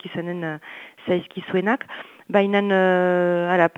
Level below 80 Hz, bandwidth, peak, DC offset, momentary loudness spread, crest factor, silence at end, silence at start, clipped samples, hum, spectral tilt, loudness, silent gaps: -72 dBFS; 7.6 kHz; -2 dBFS; under 0.1%; 16 LU; 20 dB; 0.1 s; 0.05 s; under 0.1%; none; -8 dB/octave; -21 LUFS; none